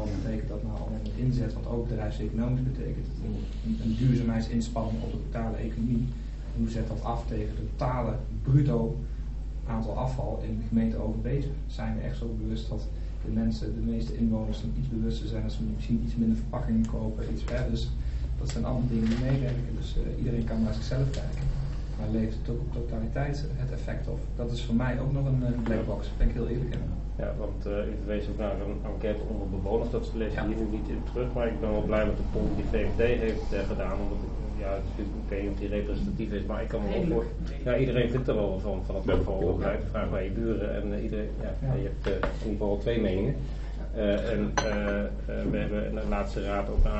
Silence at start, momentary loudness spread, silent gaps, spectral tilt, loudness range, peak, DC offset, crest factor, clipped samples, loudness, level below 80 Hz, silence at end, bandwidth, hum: 0 s; 7 LU; none; -7.5 dB/octave; 3 LU; -10 dBFS; under 0.1%; 18 dB; under 0.1%; -31 LUFS; -32 dBFS; 0 s; 8 kHz; none